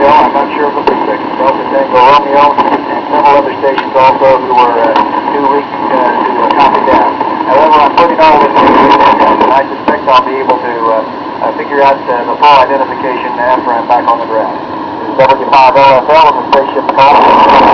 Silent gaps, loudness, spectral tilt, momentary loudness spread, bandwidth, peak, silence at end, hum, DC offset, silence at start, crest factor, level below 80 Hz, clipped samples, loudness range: none; -7 LUFS; -6 dB/octave; 8 LU; 5.4 kHz; 0 dBFS; 0 s; none; under 0.1%; 0 s; 8 dB; -42 dBFS; 4%; 3 LU